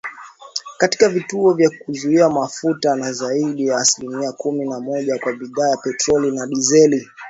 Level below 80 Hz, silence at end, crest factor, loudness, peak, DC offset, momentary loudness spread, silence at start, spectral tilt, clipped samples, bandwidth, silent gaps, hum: -60 dBFS; 0 s; 18 dB; -18 LUFS; 0 dBFS; under 0.1%; 9 LU; 0.05 s; -3.5 dB/octave; under 0.1%; 8 kHz; none; none